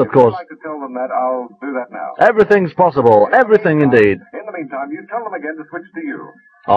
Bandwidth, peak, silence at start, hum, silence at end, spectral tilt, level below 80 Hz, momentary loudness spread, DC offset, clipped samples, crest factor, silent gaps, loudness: 6.8 kHz; 0 dBFS; 0 s; none; 0 s; -8.5 dB/octave; -54 dBFS; 17 LU; under 0.1%; 0.2%; 14 dB; none; -14 LUFS